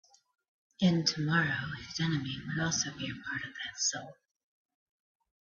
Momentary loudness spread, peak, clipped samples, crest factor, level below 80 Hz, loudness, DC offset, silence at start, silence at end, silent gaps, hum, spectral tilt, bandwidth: 11 LU; -14 dBFS; under 0.1%; 20 dB; -66 dBFS; -32 LUFS; under 0.1%; 0.8 s; 1.3 s; none; none; -3.5 dB/octave; 7.4 kHz